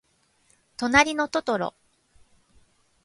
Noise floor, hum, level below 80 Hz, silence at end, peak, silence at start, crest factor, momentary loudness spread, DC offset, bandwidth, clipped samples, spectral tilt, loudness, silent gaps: -65 dBFS; none; -54 dBFS; 1.35 s; -4 dBFS; 0.8 s; 24 dB; 14 LU; under 0.1%; 11.5 kHz; under 0.1%; -3 dB/octave; -23 LUFS; none